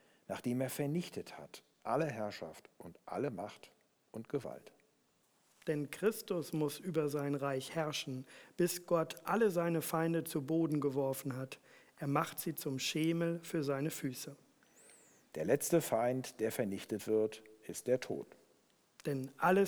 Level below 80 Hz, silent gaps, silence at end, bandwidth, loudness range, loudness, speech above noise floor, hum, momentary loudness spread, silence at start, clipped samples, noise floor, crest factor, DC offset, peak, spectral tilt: -80 dBFS; none; 0 s; over 20 kHz; 7 LU; -37 LUFS; 38 dB; none; 16 LU; 0.3 s; under 0.1%; -75 dBFS; 20 dB; under 0.1%; -18 dBFS; -5.5 dB/octave